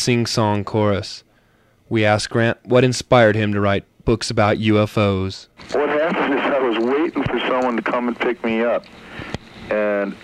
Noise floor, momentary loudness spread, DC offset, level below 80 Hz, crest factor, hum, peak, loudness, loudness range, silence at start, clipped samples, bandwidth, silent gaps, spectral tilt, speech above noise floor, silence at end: -57 dBFS; 11 LU; under 0.1%; -44 dBFS; 18 dB; none; 0 dBFS; -19 LUFS; 4 LU; 0 s; under 0.1%; 13 kHz; none; -5.5 dB/octave; 38 dB; 0.05 s